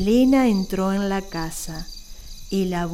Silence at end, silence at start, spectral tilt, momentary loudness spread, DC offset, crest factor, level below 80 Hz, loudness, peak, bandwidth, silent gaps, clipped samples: 0 s; 0 s; -6 dB/octave; 22 LU; under 0.1%; 14 dB; -38 dBFS; -22 LUFS; -8 dBFS; 16 kHz; none; under 0.1%